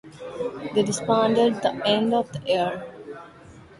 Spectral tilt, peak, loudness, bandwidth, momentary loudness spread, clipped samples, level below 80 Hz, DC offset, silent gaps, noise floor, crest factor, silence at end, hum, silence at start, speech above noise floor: -4.5 dB/octave; -8 dBFS; -23 LUFS; 11.5 kHz; 18 LU; under 0.1%; -60 dBFS; under 0.1%; none; -47 dBFS; 18 dB; 0.05 s; none; 0.05 s; 24 dB